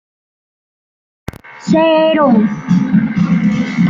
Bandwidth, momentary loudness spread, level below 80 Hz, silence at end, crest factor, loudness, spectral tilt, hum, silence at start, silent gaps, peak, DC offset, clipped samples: 7.6 kHz; 21 LU; -46 dBFS; 0 s; 12 dB; -12 LUFS; -7.5 dB/octave; none; 1.45 s; none; -2 dBFS; under 0.1%; under 0.1%